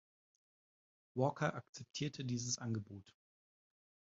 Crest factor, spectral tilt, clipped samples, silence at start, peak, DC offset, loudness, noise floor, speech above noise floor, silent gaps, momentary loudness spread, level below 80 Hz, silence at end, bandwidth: 24 dB; -5 dB/octave; under 0.1%; 1.15 s; -20 dBFS; under 0.1%; -41 LUFS; under -90 dBFS; over 49 dB; 1.69-1.73 s; 14 LU; -76 dBFS; 1.05 s; 7.4 kHz